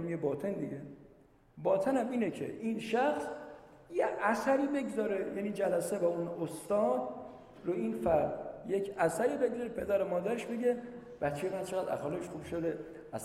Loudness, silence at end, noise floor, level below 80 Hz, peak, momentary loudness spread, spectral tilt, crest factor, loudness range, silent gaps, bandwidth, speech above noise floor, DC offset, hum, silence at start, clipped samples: -34 LUFS; 0 s; -62 dBFS; -64 dBFS; -16 dBFS; 12 LU; -6 dB/octave; 18 dB; 2 LU; none; 15 kHz; 28 dB; under 0.1%; none; 0 s; under 0.1%